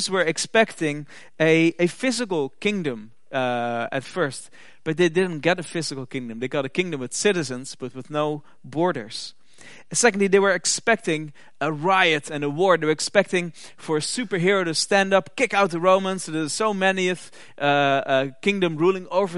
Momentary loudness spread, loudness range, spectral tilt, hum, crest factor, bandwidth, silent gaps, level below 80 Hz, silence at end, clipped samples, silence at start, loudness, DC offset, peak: 13 LU; 5 LU; -4 dB/octave; none; 22 dB; 11.5 kHz; none; -72 dBFS; 0 s; under 0.1%; 0 s; -22 LUFS; 0.6%; 0 dBFS